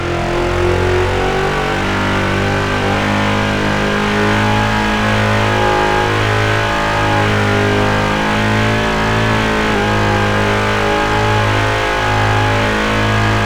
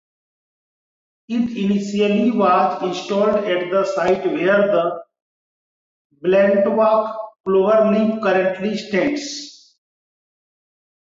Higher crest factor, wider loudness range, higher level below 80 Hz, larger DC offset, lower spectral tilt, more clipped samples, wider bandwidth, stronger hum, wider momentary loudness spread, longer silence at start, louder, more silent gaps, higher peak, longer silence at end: about the same, 14 dB vs 14 dB; about the same, 1 LU vs 3 LU; first, -28 dBFS vs -62 dBFS; neither; about the same, -5.5 dB/octave vs -6 dB/octave; neither; first, 15 kHz vs 7.8 kHz; neither; second, 2 LU vs 11 LU; second, 0 s vs 1.3 s; first, -14 LUFS vs -18 LUFS; second, none vs 5.22-6.10 s, 7.40-7.44 s; first, 0 dBFS vs -4 dBFS; second, 0 s vs 1.65 s